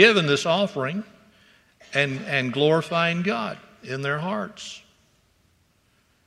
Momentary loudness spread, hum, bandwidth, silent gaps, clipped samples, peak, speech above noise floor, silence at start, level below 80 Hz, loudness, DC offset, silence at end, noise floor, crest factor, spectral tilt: 16 LU; none; 12.5 kHz; none; under 0.1%; 0 dBFS; 41 dB; 0 s; -68 dBFS; -24 LUFS; under 0.1%; 1.45 s; -64 dBFS; 24 dB; -5 dB/octave